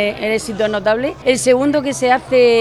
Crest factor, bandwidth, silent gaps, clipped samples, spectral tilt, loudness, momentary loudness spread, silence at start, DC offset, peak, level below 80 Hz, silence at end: 14 dB; 13.5 kHz; none; under 0.1%; -4 dB/octave; -15 LUFS; 6 LU; 0 s; under 0.1%; 0 dBFS; -46 dBFS; 0 s